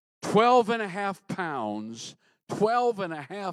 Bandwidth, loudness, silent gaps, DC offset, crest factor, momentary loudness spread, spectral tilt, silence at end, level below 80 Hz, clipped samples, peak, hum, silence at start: 12.5 kHz; -26 LUFS; 2.43-2.47 s; under 0.1%; 18 dB; 18 LU; -5 dB/octave; 0 s; -78 dBFS; under 0.1%; -8 dBFS; none; 0.2 s